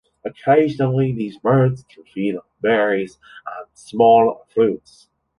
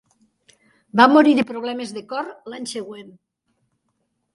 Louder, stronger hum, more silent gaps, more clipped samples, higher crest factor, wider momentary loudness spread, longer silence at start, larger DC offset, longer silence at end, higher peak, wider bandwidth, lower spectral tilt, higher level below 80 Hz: about the same, -18 LUFS vs -18 LUFS; neither; neither; neither; second, 16 dB vs 22 dB; about the same, 19 LU vs 20 LU; second, 0.25 s vs 0.95 s; neither; second, 0.6 s vs 1.25 s; about the same, -2 dBFS vs 0 dBFS; about the same, 11 kHz vs 11.5 kHz; first, -8 dB/octave vs -4.5 dB/octave; first, -58 dBFS vs -70 dBFS